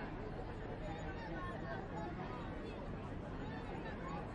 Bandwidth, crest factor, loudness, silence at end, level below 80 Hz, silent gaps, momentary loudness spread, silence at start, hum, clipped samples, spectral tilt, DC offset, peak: 10.5 kHz; 12 dB; -46 LUFS; 0 s; -52 dBFS; none; 2 LU; 0 s; none; under 0.1%; -7.5 dB/octave; under 0.1%; -32 dBFS